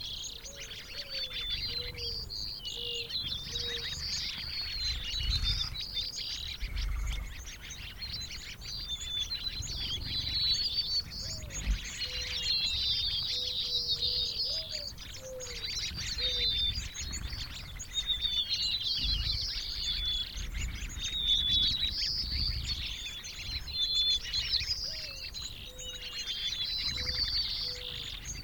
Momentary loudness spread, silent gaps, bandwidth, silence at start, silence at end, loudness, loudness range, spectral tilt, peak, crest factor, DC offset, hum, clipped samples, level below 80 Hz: 12 LU; none; 19 kHz; 0 s; 0 s; -32 LUFS; 5 LU; -1.5 dB/octave; -16 dBFS; 18 dB; under 0.1%; none; under 0.1%; -42 dBFS